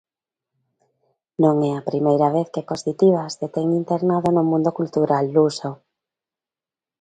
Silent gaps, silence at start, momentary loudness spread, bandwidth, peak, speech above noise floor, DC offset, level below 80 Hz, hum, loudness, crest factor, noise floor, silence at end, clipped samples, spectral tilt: none; 1.4 s; 9 LU; 9.2 kHz; -2 dBFS; over 71 dB; under 0.1%; -64 dBFS; none; -20 LUFS; 18 dB; under -90 dBFS; 1.25 s; under 0.1%; -7.5 dB/octave